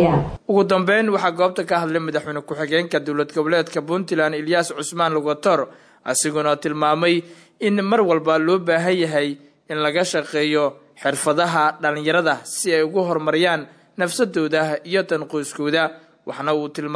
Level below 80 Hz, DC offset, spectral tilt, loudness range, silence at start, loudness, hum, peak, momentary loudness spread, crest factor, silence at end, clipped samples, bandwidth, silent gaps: -54 dBFS; under 0.1%; -4.5 dB/octave; 2 LU; 0 s; -20 LUFS; none; -4 dBFS; 8 LU; 16 dB; 0 s; under 0.1%; 11 kHz; none